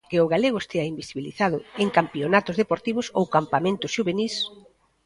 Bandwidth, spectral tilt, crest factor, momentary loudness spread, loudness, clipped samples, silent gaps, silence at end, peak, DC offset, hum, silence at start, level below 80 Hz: 11.5 kHz; -5.5 dB/octave; 20 dB; 7 LU; -24 LUFS; under 0.1%; none; 0.45 s; -4 dBFS; under 0.1%; none; 0.1 s; -60 dBFS